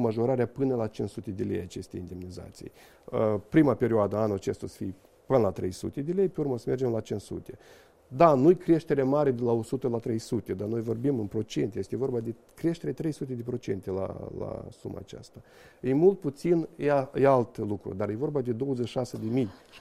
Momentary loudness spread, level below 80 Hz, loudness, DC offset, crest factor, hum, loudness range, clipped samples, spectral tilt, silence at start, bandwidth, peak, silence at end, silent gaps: 16 LU; -58 dBFS; -28 LUFS; under 0.1%; 22 dB; none; 7 LU; under 0.1%; -8 dB/octave; 0 s; 14 kHz; -6 dBFS; 0 s; none